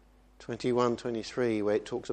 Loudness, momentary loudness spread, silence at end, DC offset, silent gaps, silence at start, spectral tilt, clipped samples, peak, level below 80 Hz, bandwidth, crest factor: -31 LUFS; 9 LU; 0 s; under 0.1%; none; 0.4 s; -6 dB/octave; under 0.1%; -12 dBFS; -62 dBFS; 9.4 kHz; 18 dB